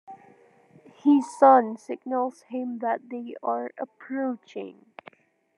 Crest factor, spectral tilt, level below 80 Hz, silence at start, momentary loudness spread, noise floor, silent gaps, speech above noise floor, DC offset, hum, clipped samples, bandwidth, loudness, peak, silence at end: 22 dB; -6 dB/octave; under -90 dBFS; 0.1 s; 20 LU; -57 dBFS; none; 31 dB; under 0.1%; none; under 0.1%; 11 kHz; -25 LUFS; -4 dBFS; 0.85 s